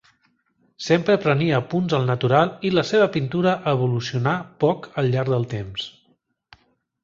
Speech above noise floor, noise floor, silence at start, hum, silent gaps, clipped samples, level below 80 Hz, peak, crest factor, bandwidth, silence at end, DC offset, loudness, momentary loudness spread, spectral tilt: 45 dB; -66 dBFS; 0.8 s; none; none; under 0.1%; -56 dBFS; -2 dBFS; 20 dB; 7.4 kHz; 1.15 s; under 0.1%; -21 LUFS; 8 LU; -7 dB/octave